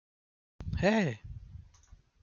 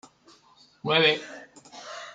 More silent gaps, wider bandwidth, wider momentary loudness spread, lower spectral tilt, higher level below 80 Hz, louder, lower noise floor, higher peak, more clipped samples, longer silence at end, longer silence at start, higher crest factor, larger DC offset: neither; second, 7.4 kHz vs 9.2 kHz; about the same, 24 LU vs 24 LU; first, -6.5 dB/octave vs -4 dB/octave; first, -50 dBFS vs -76 dBFS; second, -31 LUFS vs -23 LUFS; about the same, -60 dBFS vs -58 dBFS; second, -14 dBFS vs -6 dBFS; neither; first, 0.6 s vs 0 s; second, 0.6 s vs 0.85 s; about the same, 20 dB vs 24 dB; neither